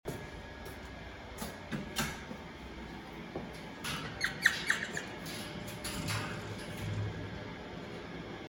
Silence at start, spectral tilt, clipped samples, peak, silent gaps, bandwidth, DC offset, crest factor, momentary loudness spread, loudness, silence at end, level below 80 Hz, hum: 0.05 s; -3.5 dB/octave; under 0.1%; -10 dBFS; none; 19 kHz; under 0.1%; 30 dB; 13 LU; -38 LUFS; 0 s; -54 dBFS; none